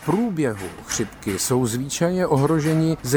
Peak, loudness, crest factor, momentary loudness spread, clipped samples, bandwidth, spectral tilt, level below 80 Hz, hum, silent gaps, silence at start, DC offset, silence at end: -4 dBFS; -22 LUFS; 16 dB; 7 LU; under 0.1%; 19.5 kHz; -5.5 dB/octave; -48 dBFS; none; none; 0 s; under 0.1%; 0 s